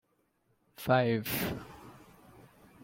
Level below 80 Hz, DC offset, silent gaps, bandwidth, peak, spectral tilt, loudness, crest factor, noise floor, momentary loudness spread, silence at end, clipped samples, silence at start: -62 dBFS; under 0.1%; none; 16.5 kHz; -12 dBFS; -5.5 dB/octave; -31 LUFS; 22 dB; -74 dBFS; 24 LU; 0.8 s; under 0.1%; 0.8 s